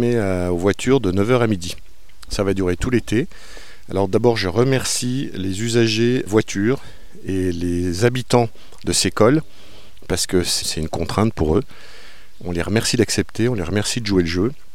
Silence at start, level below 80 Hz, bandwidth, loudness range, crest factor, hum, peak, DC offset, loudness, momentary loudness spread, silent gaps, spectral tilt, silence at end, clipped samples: 0 s; -40 dBFS; 16.5 kHz; 2 LU; 18 dB; none; -2 dBFS; 3%; -20 LUFS; 9 LU; none; -5 dB/octave; 0.2 s; under 0.1%